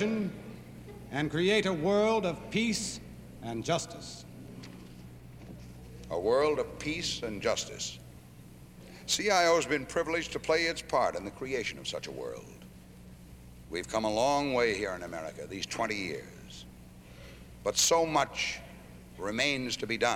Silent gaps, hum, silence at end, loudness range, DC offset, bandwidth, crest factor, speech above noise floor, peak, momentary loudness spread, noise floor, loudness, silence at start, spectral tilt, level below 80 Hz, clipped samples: none; none; 0 s; 6 LU; under 0.1%; 17 kHz; 20 dB; 20 dB; -12 dBFS; 24 LU; -51 dBFS; -31 LUFS; 0 s; -3.5 dB/octave; -56 dBFS; under 0.1%